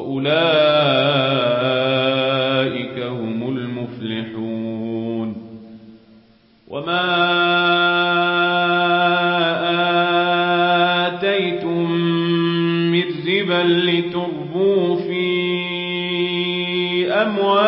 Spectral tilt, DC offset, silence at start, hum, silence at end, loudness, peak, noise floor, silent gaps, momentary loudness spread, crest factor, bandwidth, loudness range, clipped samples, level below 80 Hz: -10.5 dB/octave; under 0.1%; 0 s; none; 0 s; -18 LUFS; -4 dBFS; -52 dBFS; none; 10 LU; 14 dB; 5.8 kHz; 9 LU; under 0.1%; -62 dBFS